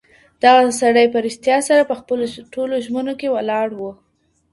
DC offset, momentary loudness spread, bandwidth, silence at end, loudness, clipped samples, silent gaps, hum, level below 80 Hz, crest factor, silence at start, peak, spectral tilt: under 0.1%; 12 LU; 11.5 kHz; 0.6 s; -17 LUFS; under 0.1%; none; none; -60 dBFS; 18 dB; 0.45 s; 0 dBFS; -3 dB/octave